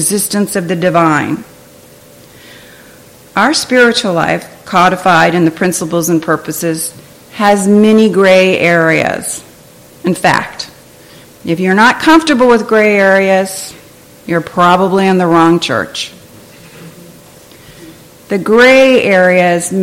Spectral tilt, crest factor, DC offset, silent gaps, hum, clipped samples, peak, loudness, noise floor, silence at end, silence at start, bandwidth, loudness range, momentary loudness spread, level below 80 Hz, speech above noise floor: -4.5 dB/octave; 12 dB; under 0.1%; none; none; under 0.1%; 0 dBFS; -10 LUFS; -39 dBFS; 0 s; 0 s; 17 kHz; 5 LU; 13 LU; -48 dBFS; 29 dB